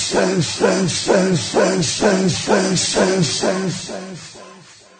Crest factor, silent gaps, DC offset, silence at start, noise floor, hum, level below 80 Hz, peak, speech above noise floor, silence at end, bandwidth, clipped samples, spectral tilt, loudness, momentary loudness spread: 14 dB; none; under 0.1%; 0 s; -43 dBFS; none; -50 dBFS; -4 dBFS; 26 dB; 0.4 s; 9.4 kHz; under 0.1%; -4 dB/octave; -17 LUFS; 13 LU